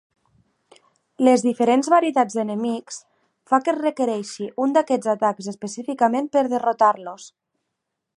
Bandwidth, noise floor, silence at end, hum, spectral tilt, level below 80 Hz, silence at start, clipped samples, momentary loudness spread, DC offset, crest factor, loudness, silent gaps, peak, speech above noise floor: 11 kHz; -80 dBFS; 0.9 s; none; -5 dB/octave; -76 dBFS; 1.2 s; under 0.1%; 13 LU; under 0.1%; 18 dB; -21 LUFS; none; -4 dBFS; 60 dB